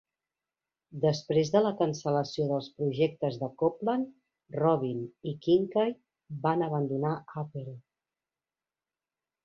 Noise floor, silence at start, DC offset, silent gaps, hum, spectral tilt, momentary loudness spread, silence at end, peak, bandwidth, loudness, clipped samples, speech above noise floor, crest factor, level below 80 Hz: under -90 dBFS; 0.9 s; under 0.1%; none; none; -7 dB/octave; 13 LU; 1.65 s; -12 dBFS; 7.4 kHz; -30 LUFS; under 0.1%; over 61 dB; 20 dB; -70 dBFS